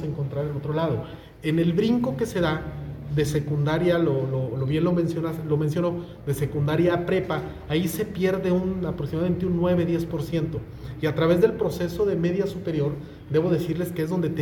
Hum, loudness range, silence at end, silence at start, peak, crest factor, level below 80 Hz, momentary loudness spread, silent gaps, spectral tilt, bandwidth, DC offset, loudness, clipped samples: none; 1 LU; 0 s; 0 s; -6 dBFS; 18 dB; -46 dBFS; 7 LU; none; -7.5 dB/octave; 18 kHz; under 0.1%; -25 LUFS; under 0.1%